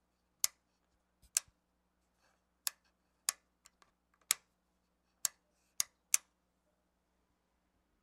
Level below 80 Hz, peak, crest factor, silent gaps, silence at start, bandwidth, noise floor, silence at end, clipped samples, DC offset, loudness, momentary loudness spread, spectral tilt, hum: -82 dBFS; -6 dBFS; 38 dB; none; 0.45 s; 15 kHz; -80 dBFS; 1.85 s; under 0.1%; under 0.1%; -38 LUFS; 8 LU; 3.5 dB/octave; none